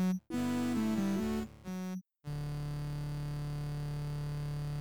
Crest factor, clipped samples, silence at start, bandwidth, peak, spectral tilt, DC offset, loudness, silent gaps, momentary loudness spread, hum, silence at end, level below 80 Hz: 12 dB; under 0.1%; 0 s; over 20 kHz; -24 dBFS; -7 dB/octave; 0.1%; -37 LUFS; none; 9 LU; none; 0 s; -50 dBFS